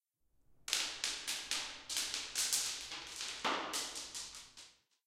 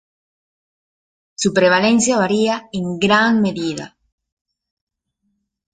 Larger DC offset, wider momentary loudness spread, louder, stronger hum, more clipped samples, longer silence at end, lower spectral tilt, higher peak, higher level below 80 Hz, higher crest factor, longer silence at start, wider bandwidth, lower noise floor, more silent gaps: neither; first, 14 LU vs 11 LU; second, -38 LUFS vs -16 LUFS; neither; neither; second, 0.35 s vs 1.9 s; second, 1 dB/octave vs -4 dB/octave; second, -10 dBFS vs -2 dBFS; second, -72 dBFS vs -58 dBFS; first, 32 dB vs 18 dB; second, 0.5 s vs 1.4 s; first, 16 kHz vs 9.4 kHz; about the same, -73 dBFS vs -71 dBFS; neither